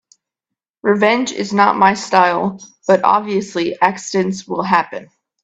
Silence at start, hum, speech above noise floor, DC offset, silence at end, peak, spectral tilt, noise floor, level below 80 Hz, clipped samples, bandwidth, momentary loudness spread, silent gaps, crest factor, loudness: 0.85 s; none; 67 dB; under 0.1%; 0.4 s; 0 dBFS; -4.5 dB/octave; -83 dBFS; -60 dBFS; under 0.1%; 8.4 kHz; 9 LU; none; 16 dB; -16 LUFS